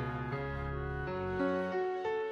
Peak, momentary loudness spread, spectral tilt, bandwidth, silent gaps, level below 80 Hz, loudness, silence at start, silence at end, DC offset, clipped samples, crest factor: -22 dBFS; 5 LU; -8.5 dB/octave; 7.2 kHz; none; -48 dBFS; -36 LUFS; 0 s; 0 s; under 0.1%; under 0.1%; 14 dB